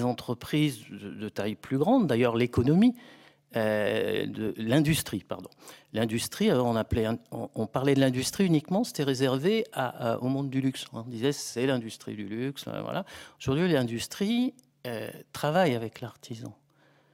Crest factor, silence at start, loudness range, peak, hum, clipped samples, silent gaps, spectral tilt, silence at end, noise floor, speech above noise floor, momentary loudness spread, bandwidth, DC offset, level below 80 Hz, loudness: 18 dB; 0 s; 5 LU; -10 dBFS; none; under 0.1%; none; -5.5 dB/octave; 0.6 s; -64 dBFS; 36 dB; 14 LU; 16.5 kHz; under 0.1%; -56 dBFS; -28 LUFS